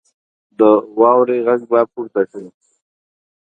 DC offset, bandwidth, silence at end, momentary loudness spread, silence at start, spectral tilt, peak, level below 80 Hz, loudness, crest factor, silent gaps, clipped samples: under 0.1%; 3.9 kHz; 1.1 s; 9 LU; 0.6 s; -8.5 dB/octave; 0 dBFS; -68 dBFS; -15 LUFS; 16 dB; none; under 0.1%